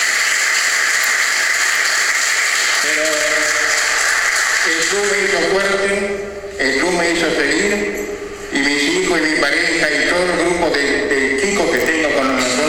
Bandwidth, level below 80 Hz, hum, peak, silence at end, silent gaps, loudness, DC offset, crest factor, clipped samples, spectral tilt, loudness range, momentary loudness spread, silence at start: 18 kHz; -44 dBFS; none; 0 dBFS; 0 s; none; -14 LUFS; under 0.1%; 16 dB; under 0.1%; -1.5 dB/octave; 3 LU; 4 LU; 0 s